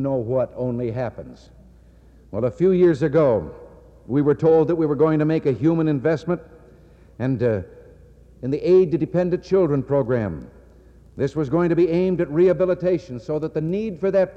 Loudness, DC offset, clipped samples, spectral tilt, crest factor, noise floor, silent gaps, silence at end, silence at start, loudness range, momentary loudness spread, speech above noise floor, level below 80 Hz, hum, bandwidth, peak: -21 LUFS; under 0.1%; under 0.1%; -9.5 dB/octave; 14 dB; -49 dBFS; none; 0 s; 0 s; 4 LU; 11 LU; 29 dB; -48 dBFS; none; 7.8 kHz; -8 dBFS